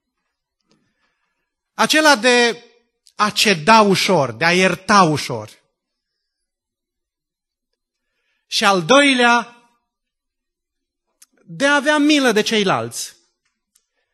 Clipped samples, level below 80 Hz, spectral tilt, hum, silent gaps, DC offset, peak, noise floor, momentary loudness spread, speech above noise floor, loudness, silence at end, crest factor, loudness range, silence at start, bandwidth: under 0.1%; -64 dBFS; -3.5 dB/octave; none; none; under 0.1%; 0 dBFS; -83 dBFS; 15 LU; 68 dB; -15 LUFS; 1.05 s; 18 dB; 6 LU; 1.8 s; 12.5 kHz